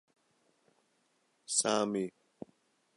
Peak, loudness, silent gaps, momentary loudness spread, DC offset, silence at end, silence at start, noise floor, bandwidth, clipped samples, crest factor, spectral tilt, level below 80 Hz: -14 dBFS; -32 LUFS; none; 23 LU; under 0.1%; 0.9 s; 1.5 s; -75 dBFS; 11.5 kHz; under 0.1%; 24 dB; -2.5 dB/octave; -80 dBFS